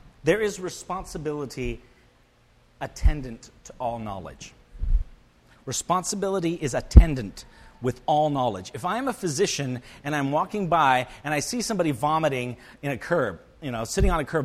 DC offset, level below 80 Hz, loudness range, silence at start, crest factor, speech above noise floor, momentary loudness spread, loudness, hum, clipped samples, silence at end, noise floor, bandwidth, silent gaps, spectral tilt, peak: under 0.1%; -30 dBFS; 9 LU; 0.05 s; 26 dB; 35 dB; 16 LU; -26 LUFS; none; under 0.1%; 0 s; -59 dBFS; 14 kHz; none; -5 dB/octave; 0 dBFS